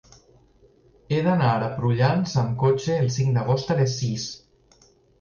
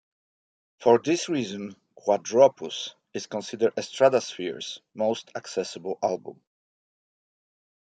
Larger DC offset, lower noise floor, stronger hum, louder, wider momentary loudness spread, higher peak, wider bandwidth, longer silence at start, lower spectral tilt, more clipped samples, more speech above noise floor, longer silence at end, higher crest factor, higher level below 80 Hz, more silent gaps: neither; second, -57 dBFS vs under -90 dBFS; neither; first, -23 LUFS vs -26 LUFS; second, 7 LU vs 14 LU; second, -8 dBFS vs -4 dBFS; second, 7.2 kHz vs 9.2 kHz; first, 1.1 s vs 0.8 s; first, -6.5 dB/octave vs -4 dB/octave; neither; second, 36 dB vs over 65 dB; second, 0.85 s vs 1.6 s; second, 16 dB vs 22 dB; first, -54 dBFS vs -76 dBFS; neither